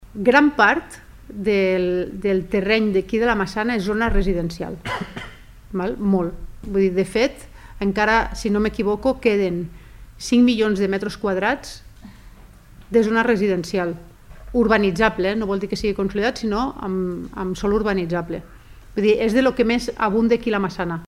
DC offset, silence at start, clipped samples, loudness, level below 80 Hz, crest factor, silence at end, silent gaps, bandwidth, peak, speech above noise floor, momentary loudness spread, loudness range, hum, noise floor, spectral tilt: under 0.1%; 0 s; under 0.1%; -20 LUFS; -36 dBFS; 20 dB; 0 s; none; 15.5 kHz; 0 dBFS; 25 dB; 11 LU; 4 LU; none; -44 dBFS; -6 dB/octave